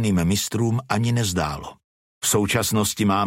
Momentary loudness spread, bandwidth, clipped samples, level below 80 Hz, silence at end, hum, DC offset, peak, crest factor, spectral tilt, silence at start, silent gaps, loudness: 7 LU; 16.5 kHz; under 0.1%; -46 dBFS; 0 s; none; under 0.1%; -6 dBFS; 16 dB; -4.5 dB/octave; 0 s; 1.84-2.21 s; -22 LUFS